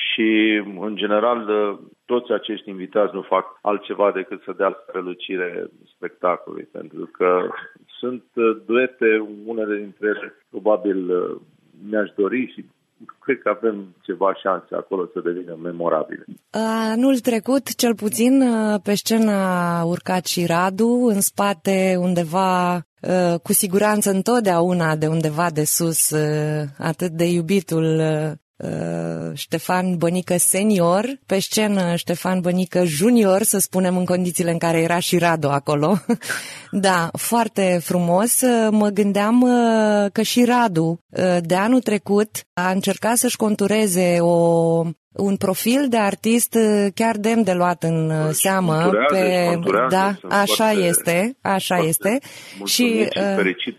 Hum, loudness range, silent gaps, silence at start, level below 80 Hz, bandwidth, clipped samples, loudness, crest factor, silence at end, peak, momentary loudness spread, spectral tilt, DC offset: none; 6 LU; 22.85-22.97 s, 28.42-28.54 s, 41.01-41.09 s, 42.46-42.56 s, 44.97-45.11 s; 0 s; -66 dBFS; 13.5 kHz; under 0.1%; -19 LUFS; 14 dB; 0.05 s; -4 dBFS; 11 LU; -4.5 dB/octave; under 0.1%